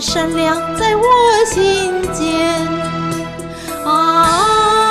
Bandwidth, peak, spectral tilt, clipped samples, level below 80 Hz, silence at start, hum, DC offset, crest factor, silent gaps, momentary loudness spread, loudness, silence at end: 15.5 kHz; -2 dBFS; -3.5 dB/octave; under 0.1%; -38 dBFS; 0 s; none; under 0.1%; 12 dB; none; 11 LU; -14 LUFS; 0 s